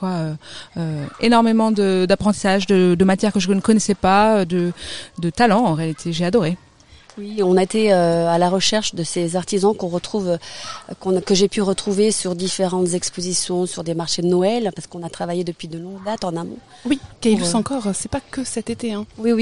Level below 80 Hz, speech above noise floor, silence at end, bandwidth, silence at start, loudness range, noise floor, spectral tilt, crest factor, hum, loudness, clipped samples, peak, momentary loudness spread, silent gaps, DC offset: -48 dBFS; 28 dB; 0 s; 11 kHz; 0 s; 6 LU; -47 dBFS; -5 dB/octave; 18 dB; none; -19 LUFS; under 0.1%; -2 dBFS; 13 LU; none; 0.6%